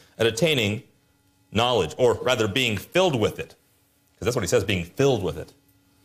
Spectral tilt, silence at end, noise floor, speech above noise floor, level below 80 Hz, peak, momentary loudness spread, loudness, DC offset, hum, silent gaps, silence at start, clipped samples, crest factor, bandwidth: -4.5 dB/octave; 0.6 s; -63 dBFS; 41 dB; -56 dBFS; -8 dBFS; 11 LU; -23 LUFS; under 0.1%; none; none; 0.2 s; under 0.1%; 16 dB; 15.5 kHz